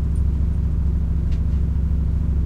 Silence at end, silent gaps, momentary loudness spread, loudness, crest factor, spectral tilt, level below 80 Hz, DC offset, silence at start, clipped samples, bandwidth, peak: 0 s; none; 1 LU; -22 LUFS; 8 dB; -10 dB/octave; -20 dBFS; under 0.1%; 0 s; under 0.1%; 3 kHz; -10 dBFS